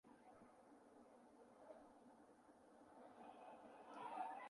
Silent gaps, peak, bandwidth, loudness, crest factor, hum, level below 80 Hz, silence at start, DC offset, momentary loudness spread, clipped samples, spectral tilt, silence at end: none; -36 dBFS; 11 kHz; -61 LUFS; 24 dB; none; under -90 dBFS; 0.05 s; under 0.1%; 14 LU; under 0.1%; -4.5 dB/octave; 0 s